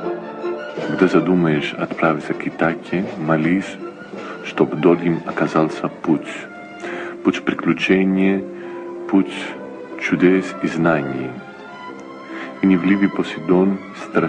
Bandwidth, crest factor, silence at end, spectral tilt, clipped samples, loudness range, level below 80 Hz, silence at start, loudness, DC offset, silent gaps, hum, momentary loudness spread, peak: 9.4 kHz; 18 dB; 0 s; -7 dB/octave; under 0.1%; 2 LU; -58 dBFS; 0 s; -19 LUFS; under 0.1%; none; none; 16 LU; -2 dBFS